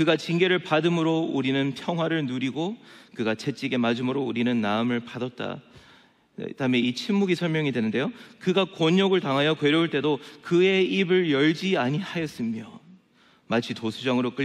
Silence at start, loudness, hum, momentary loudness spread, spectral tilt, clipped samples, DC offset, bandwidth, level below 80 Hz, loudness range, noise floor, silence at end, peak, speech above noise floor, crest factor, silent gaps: 0 s; -25 LUFS; none; 10 LU; -6 dB/octave; under 0.1%; under 0.1%; 12.5 kHz; -72 dBFS; 5 LU; -60 dBFS; 0 s; -8 dBFS; 35 dB; 16 dB; none